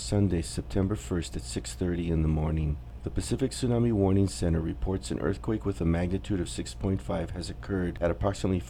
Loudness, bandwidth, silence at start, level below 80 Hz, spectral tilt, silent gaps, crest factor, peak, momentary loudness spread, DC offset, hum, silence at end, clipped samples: -30 LUFS; 13.5 kHz; 0 s; -38 dBFS; -6.5 dB/octave; none; 16 dB; -12 dBFS; 8 LU; under 0.1%; none; 0 s; under 0.1%